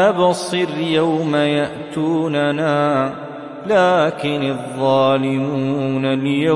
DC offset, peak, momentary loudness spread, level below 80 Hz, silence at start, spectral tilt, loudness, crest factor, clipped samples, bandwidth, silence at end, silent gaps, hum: under 0.1%; -2 dBFS; 8 LU; -64 dBFS; 0 s; -6 dB/octave; -18 LUFS; 14 dB; under 0.1%; 11.5 kHz; 0 s; none; none